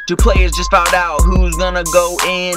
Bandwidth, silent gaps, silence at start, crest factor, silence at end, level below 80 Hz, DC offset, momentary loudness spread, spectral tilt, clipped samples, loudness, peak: 16 kHz; none; 0 s; 12 dB; 0 s; -16 dBFS; under 0.1%; 4 LU; -4 dB/octave; under 0.1%; -13 LUFS; 0 dBFS